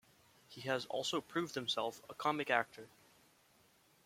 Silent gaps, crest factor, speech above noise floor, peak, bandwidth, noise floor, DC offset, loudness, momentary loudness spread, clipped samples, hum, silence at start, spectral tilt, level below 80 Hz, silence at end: none; 26 dB; 31 dB; -16 dBFS; 16.5 kHz; -70 dBFS; under 0.1%; -38 LUFS; 16 LU; under 0.1%; none; 0.5 s; -3.5 dB/octave; -82 dBFS; 1.2 s